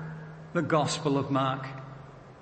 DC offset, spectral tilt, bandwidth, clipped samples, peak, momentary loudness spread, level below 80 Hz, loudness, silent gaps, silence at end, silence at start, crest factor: under 0.1%; -5.5 dB/octave; 8.8 kHz; under 0.1%; -12 dBFS; 19 LU; -62 dBFS; -28 LUFS; none; 0 s; 0 s; 18 dB